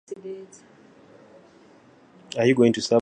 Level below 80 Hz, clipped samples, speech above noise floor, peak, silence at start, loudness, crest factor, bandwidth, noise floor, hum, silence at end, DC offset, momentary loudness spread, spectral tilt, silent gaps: -68 dBFS; under 0.1%; 32 dB; -6 dBFS; 0.1 s; -21 LUFS; 20 dB; 9.8 kHz; -53 dBFS; none; 0 s; under 0.1%; 20 LU; -5.5 dB/octave; none